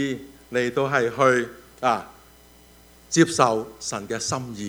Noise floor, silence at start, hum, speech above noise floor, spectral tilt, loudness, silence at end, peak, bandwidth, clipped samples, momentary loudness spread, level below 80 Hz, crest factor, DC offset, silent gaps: -51 dBFS; 0 s; none; 29 dB; -4 dB/octave; -23 LUFS; 0 s; -2 dBFS; over 20 kHz; under 0.1%; 11 LU; -58 dBFS; 22 dB; under 0.1%; none